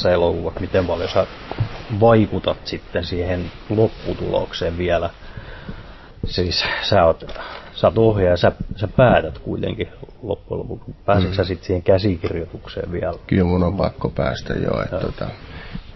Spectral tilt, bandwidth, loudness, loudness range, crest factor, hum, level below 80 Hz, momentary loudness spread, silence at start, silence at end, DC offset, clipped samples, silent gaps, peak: -7.5 dB/octave; 6 kHz; -20 LUFS; 5 LU; 18 dB; none; -34 dBFS; 16 LU; 0 s; 0 s; under 0.1%; under 0.1%; none; -2 dBFS